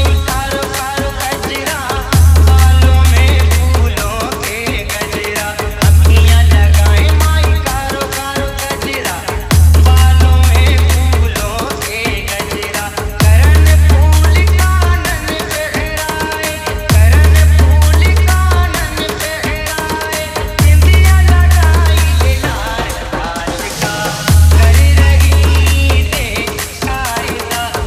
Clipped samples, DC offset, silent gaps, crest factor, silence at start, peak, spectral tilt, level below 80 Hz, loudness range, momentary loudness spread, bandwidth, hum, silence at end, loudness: under 0.1%; under 0.1%; none; 10 dB; 0 s; 0 dBFS; -4.5 dB/octave; -12 dBFS; 2 LU; 10 LU; 15.5 kHz; none; 0 s; -11 LUFS